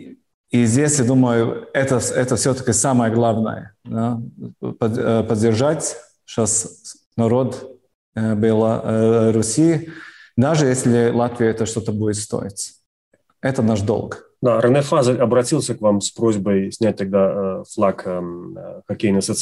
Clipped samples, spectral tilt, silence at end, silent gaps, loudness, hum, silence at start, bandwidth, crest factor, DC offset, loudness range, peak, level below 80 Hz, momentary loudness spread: under 0.1%; -5.5 dB/octave; 0 s; 0.34-0.44 s, 7.06-7.11 s, 7.95-8.13 s, 12.86-13.12 s; -19 LUFS; none; 0 s; 12.5 kHz; 14 dB; under 0.1%; 3 LU; -6 dBFS; -54 dBFS; 14 LU